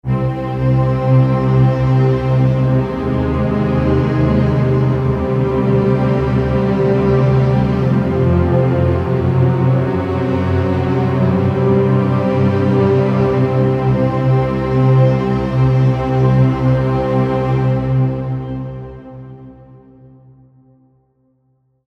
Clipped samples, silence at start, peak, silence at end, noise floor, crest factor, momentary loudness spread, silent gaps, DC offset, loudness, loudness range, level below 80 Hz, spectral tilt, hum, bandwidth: under 0.1%; 0.05 s; -2 dBFS; 2.35 s; -60 dBFS; 12 dB; 5 LU; none; under 0.1%; -15 LUFS; 4 LU; -32 dBFS; -10 dB/octave; none; 5.6 kHz